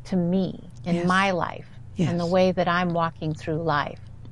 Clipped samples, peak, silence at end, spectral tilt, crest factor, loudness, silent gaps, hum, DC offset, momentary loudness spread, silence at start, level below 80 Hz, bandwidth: under 0.1%; -8 dBFS; 0 s; -6.5 dB/octave; 16 dB; -24 LUFS; none; none; 0.5%; 12 LU; 0 s; -50 dBFS; 10.5 kHz